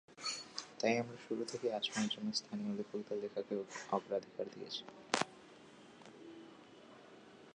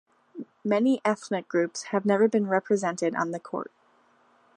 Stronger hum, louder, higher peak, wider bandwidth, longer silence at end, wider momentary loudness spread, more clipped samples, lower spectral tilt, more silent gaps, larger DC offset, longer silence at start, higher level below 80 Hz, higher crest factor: neither; second, -40 LUFS vs -26 LUFS; second, -14 dBFS vs -10 dBFS; about the same, 10.5 kHz vs 11 kHz; second, 0 s vs 0.9 s; first, 21 LU vs 16 LU; neither; second, -3.5 dB/octave vs -5.5 dB/octave; neither; neither; second, 0.1 s vs 0.35 s; about the same, -84 dBFS vs -80 dBFS; first, 28 dB vs 18 dB